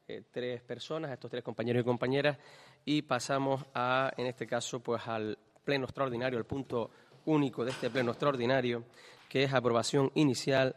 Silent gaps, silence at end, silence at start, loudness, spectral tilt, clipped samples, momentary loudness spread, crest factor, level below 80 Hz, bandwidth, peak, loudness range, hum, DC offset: none; 0.05 s; 0.1 s; -33 LUFS; -5.5 dB/octave; under 0.1%; 11 LU; 22 dB; -70 dBFS; 13.5 kHz; -12 dBFS; 3 LU; none; under 0.1%